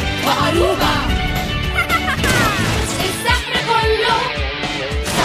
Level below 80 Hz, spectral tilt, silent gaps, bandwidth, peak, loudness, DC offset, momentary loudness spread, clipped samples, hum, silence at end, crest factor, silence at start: -26 dBFS; -4 dB/octave; none; 15.5 kHz; -2 dBFS; -17 LUFS; under 0.1%; 5 LU; under 0.1%; none; 0 s; 16 dB; 0 s